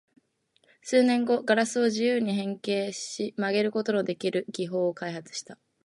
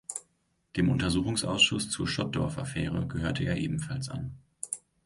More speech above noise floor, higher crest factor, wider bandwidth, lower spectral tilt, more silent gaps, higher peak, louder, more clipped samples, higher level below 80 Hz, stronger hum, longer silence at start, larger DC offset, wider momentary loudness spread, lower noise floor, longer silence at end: about the same, 42 dB vs 44 dB; about the same, 18 dB vs 20 dB; about the same, 11.5 kHz vs 11.5 kHz; about the same, -4.5 dB/octave vs -4 dB/octave; neither; about the same, -10 dBFS vs -10 dBFS; first, -27 LUFS vs -30 LUFS; neither; second, -80 dBFS vs -48 dBFS; neither; first, 0.85 s vs 0.1 s; neither; second, 11 LU vs 15 LU; second, -69 dBFS vs -73 dBFS; about the same, 0.3 s vs 0.3 s